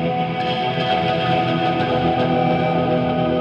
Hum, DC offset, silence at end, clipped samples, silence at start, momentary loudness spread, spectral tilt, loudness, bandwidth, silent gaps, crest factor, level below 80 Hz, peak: none; under 0.1%; 0 s; under 0.1%; 0 s; 3 LU; -8 dB/octave; -19 LUFS; 7 kHz; none; 12 dB; -46 dBFS; -6 dBFS